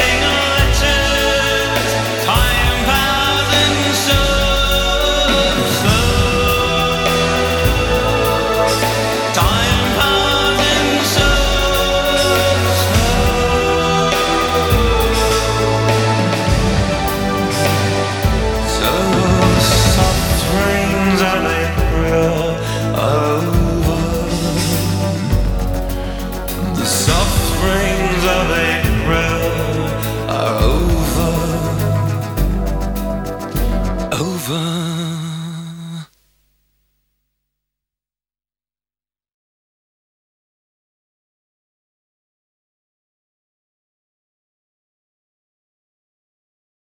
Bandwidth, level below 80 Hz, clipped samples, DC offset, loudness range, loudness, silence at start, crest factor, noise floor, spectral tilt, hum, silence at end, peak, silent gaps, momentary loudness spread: 19.5 kHz; -24 dBFS; under 0.1%; under 0.1%; 6 LU; -15 LUFS; 0 s; 16 dB; under -90 dBFS; -4 dB/octave; none; 10.8 s; 0 dBFS; none; 7 LU